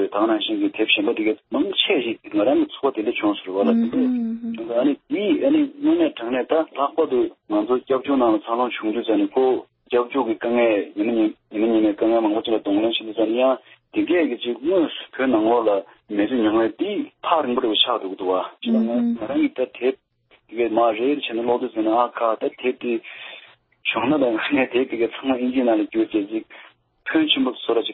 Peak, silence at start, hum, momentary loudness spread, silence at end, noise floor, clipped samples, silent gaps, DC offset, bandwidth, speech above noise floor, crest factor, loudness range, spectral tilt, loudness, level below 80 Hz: -2 dBFS; 0 s; none; 7 LU; 0 s; -46 dBFS; under 0.1%; none; under 0.1%; 4.1 kHz; 25 dB; 18 dB; 2 LU; -9.5 dB/octave; -21 LUFS; -62 dBFS